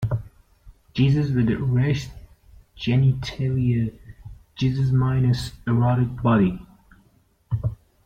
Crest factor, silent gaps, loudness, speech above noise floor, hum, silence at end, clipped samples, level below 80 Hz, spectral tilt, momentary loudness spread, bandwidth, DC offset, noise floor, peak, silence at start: 16 dB; none; -23 LUFS; 40 dB; none; 0.3 s; under 0.1%; -44 dBFS; -8 dB/octave; 11 LU; 9 kHz; under 0.1%; -60 dBFS; -8 dBFS; 0 s